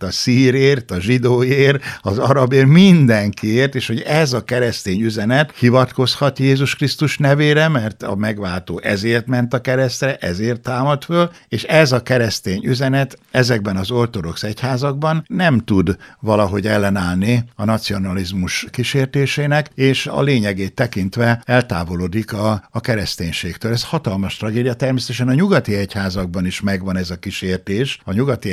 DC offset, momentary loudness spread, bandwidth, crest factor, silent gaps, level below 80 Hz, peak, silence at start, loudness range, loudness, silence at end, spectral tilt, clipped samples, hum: under 0.1%; 8 LU; 15 kHz; 16 dB; none; -46 dBFS; 0 dBFS; 0 s; 6 LU; -17 LUFS; 0 s; -6 dB/octave; under 0.1%; none